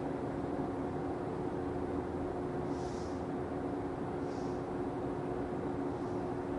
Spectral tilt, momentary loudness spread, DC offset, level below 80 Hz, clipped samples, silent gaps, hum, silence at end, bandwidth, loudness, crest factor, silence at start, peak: -8 dB/octave; 1 LU; under 0.1%; -52 dBFS; under 0.1%; none; none; 0 s; 11.5 kHz; -38 LUFS; 14 dB; 0 s; -24 dBFS